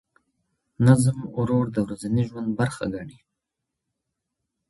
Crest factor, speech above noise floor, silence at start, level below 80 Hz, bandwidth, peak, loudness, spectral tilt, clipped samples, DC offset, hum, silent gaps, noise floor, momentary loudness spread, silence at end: 22 dB; 61 dB; 0.8 s; -54 dBFS; 11.5 kHz; -4 dBFS; -23 LUFS; -7.5 dB/octave; under 0.1%; under 0.1%; none; none; -83 dBFS; 13 LU; 1.6 s